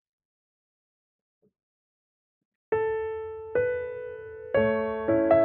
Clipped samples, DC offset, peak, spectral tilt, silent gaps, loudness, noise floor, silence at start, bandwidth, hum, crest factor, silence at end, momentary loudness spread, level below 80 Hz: under 0.1%; under 0.1%; -8 dBFS; -6 dB/octave; none; -28 LUFS; under -90 dBFS; 2.7 s; 4.3 kHz; none; 20 dB; 0 s; 12 LU; -58 dBFS